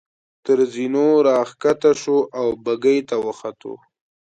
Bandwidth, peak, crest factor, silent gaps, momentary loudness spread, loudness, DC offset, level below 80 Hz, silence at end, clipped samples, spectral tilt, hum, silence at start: 9 kHz; -4 dBFS; 16 dB; none; 16 LU; -19 LUFS; under 0.1%; -64 dBFS; 0.55 s; under 0.1%; -5.5 dB/octave; none; 0.45 s